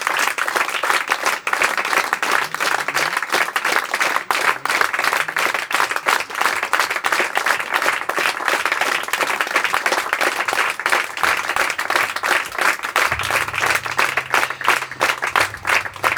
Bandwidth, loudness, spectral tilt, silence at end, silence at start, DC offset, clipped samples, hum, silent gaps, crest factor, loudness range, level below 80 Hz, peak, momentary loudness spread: over 20 kHz; -18 LUFS; -0.5 dB/octave; 0 s; 0 s; under 0.1%; under 0.1%; none; none; 20 dB; 0 LU; -56 dBFS; 0 dBFS; 2 LU